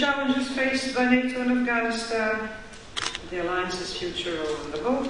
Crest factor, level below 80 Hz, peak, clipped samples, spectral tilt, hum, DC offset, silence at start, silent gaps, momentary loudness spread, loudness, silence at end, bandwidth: 18 dB; -50 dBFS; -8 dBFS; under 0.1%; -3.5 dB/octave; none; 0.3%; 0 s; none; 8 LU; -26 LUFS; 0 s; 10.5 kHz